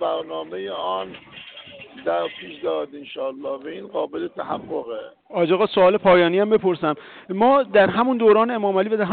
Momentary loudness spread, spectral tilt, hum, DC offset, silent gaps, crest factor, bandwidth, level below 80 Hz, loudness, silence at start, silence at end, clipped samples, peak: 17 LU; -10.5 dB/octave; none; under 0.1%; none; 14 dB; 4.6 kHz; -60 dBFS; -21 LUFS; 0 s; 0 s; under 0.1%; -6 dBFS